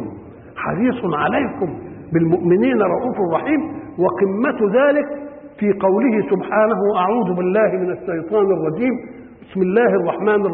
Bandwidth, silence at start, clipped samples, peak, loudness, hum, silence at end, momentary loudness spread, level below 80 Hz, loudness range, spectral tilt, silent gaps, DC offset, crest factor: 3.9 kHz; 0 s; under 0.1%; -4 dBFS; -18 LUFS; none; 0 s; 12 LU; -52 dBFS; 1 LU; -12.5 dB/octave; none; under 0.1%; 14 dB